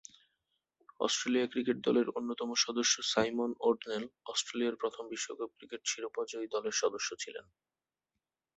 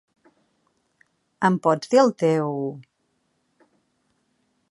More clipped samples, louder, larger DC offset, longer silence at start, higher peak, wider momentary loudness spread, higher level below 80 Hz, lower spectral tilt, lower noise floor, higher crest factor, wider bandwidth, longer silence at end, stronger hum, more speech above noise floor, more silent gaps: neither; second, -34 LUFS vs -21 LUFS; neither; second, 1 s vs 1.4 s; second, -14 dBFS vs -4 dBFS; second, 10 LU vs 13 LU; about the same, -76 dBFS vs -76 dBFS; second, -2 dB/octave vs -6.5 dB/octave; first, -90 dBFS vs -71 dBFS; about the same, 22 dB vs 22 dB; second, 8.4 kHz vs 11.5 kHz; second, 1.15 s vs 1.9 s; neither; first, 55 dB vs 51 dB; neither